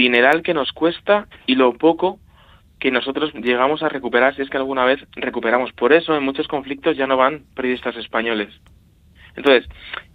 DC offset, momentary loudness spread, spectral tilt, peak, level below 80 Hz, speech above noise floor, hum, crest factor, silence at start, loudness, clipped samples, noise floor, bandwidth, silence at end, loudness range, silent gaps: under 0.1%; 9 LU; -6 dB/octave; 0 dBFS; -52 dBFS; 31 dB; none; 18 dB; 0 s; -19 LUFS; under 0.1%; -50 dBFS; 6.2 kHz; 0.15 s; 2 LU; none